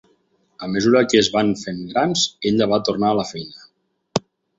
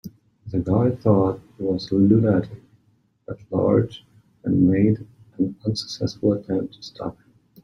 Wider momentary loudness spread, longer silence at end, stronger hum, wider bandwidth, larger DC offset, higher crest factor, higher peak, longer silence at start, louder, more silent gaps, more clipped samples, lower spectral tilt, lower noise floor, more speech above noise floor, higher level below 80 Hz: second, 12 LU vs 16 LU; about the same, 0.4 s vs 0.5 s; neither; second, 8 kHz vs 10 kHz; neither; about the same, 18 dB vs 18 dB; about the same, -2 dBFS vs -4 dBFS; first, 0.6 s vs 0.05 s; first, -19 LUFS vs -22 LUFS; neither; neither; second, -4.5 dB/octave vs -8 dB/octave; about the same, -63 dBFS vs -63 dBFS; about the same, 44 dB vs 42 dB; about the same, -56 dBFS vs -52 dBFS